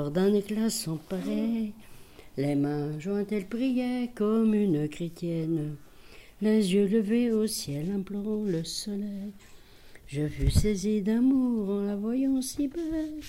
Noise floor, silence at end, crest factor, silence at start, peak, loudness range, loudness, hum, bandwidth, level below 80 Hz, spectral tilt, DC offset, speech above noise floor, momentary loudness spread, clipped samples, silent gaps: -51 dBFS; 0 s; 18 dB; 0 s; -10 dBFS; 3 LU; -28 LUFS; none; 16 kHz; -44 dBFS; -6 dB/octave; 0.1%; 23 dB; 9 LU; under 0.1%; none